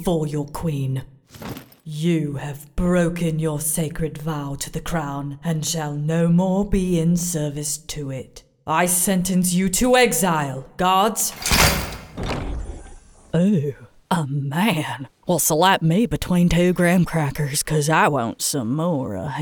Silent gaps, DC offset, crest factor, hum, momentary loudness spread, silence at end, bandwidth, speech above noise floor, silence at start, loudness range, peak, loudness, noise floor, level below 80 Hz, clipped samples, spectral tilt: none; under 0.1%; 20 dB; none; 13 LU; 0 s; over 20 kHz; 23 dB; 0 s; 5 LU; -2 dBFS; -21 LUFS; -43 dBFS; -38 dBFS; under 0.1%; -4.5 dB/octave